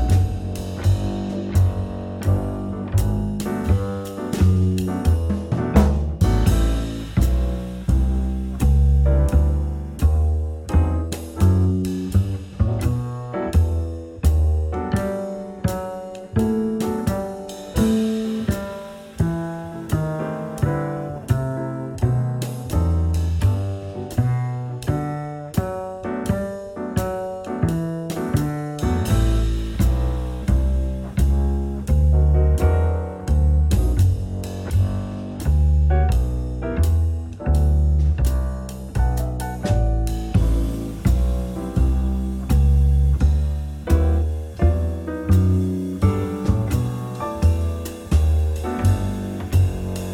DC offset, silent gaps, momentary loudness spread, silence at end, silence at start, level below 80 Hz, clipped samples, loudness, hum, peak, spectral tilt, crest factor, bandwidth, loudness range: under 0.1%; none; 10 LU; 0 s; 0 s; -22 dBFS; under 0.1%; -22 LUFS; none; -2 dBFS; -7.5 dB/octave; 18 dB; 16 kHz; 4 LU